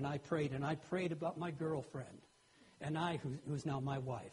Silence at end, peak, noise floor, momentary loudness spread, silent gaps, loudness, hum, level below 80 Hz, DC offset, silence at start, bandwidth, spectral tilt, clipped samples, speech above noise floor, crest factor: 0 s; -24 dBFS; -67 dBFS; 7 LU; none; -41 LUFS; none; -70 dBFS; under 0.1%; 0 s; 11 kHz; -7 dB/octave; under 0.1%; 27 dB; 18 dB